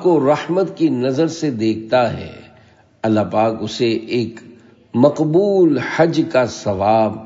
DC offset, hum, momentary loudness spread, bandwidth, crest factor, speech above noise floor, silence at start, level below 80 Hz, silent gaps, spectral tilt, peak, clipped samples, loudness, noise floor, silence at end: under 0.1%; none; 7 LU; 7.8 kHz; 16 dB; 33 dB; 0 s; -58 dBFS; none; -6.5 dB/octave; 0 dBFS; under 0.1%; -17 LUFS; -49 dBFS; 0 s